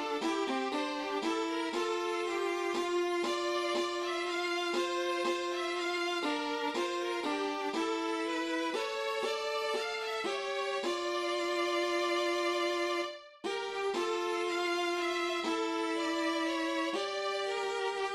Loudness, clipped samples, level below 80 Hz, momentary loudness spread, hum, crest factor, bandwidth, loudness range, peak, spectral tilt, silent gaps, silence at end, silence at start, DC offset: -33 LUFS; under 0.1%; -76 dBFS; 3 LU; none; 12 dB; 13 kHz; 1 LU; -22 dBFS; -1.5 dB/octave; none; 0 s; 0 s; under 0.1%